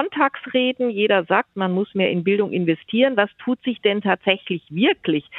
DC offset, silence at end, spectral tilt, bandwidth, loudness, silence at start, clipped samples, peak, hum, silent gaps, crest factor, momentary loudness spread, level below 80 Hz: under 0.1%; 0 s; -9 dB/octave; 4.1 kHz; -20 LUFS; 0 s; under 0.1%; -2 dBFS; none; none; 18 dB; 4 LU; -68 dBFS